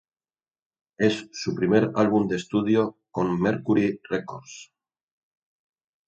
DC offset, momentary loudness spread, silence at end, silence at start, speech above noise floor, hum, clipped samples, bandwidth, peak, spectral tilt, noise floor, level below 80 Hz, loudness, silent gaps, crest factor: under 0.1%; 11 LU; 1.45 s; 1 s; over 66 dB; none; under 0.1%; 8.4 kHz; -6 dBFS; -6.5 dB/octave; under -90 dBFS; -60 dBFS; -24 LUFS; none; 20 dB